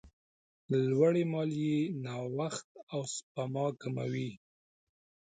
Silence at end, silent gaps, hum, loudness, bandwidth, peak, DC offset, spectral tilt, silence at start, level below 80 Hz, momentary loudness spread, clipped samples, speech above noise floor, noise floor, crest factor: 0.95 s; 0.13-0.69 s, 2.64-2.75 s, 2.83-2.87 s, 3.23-3.35 s; none; -34 LUFS; 9.6 kHz; -16 dBFS; under 0.1%; -6.5 dB/octave; 0.05 s; -74 dBFS; 12 LU; under 0.1%; over 57 dB; under -90 dBFS; 20 dB